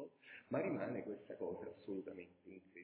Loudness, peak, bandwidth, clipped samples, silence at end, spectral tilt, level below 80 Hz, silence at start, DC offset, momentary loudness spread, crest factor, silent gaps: -46 LUFS; -28 dBFS; 4 kHz; under 0.1%; 0 s; -7 dB/octave; -80 dBFS; 0 s; under 0.1%; 17 LU; 20 dB; none